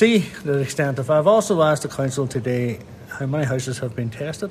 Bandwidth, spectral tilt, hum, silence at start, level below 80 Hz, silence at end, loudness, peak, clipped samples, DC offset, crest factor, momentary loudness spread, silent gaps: 14 kHz; -6 dB/octave; none; 0 s; -54 dBFS; 0 s; -21 LUFS; -4 dBFS; under 0.1%; under 0.1%; 18 dB; 11 LU; none